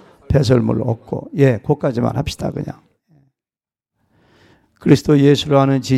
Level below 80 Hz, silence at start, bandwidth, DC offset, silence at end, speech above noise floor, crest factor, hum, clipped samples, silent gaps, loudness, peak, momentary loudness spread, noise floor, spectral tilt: -40 dBFS; 0.3 s; 13 kHz; under 0.1%; 0 s; over 75 dB; 16 dB; none; under 0.1%; none; -16 LUFS; 0 dBFS; 12 LU; under -90 dBFS; -7 dB/octave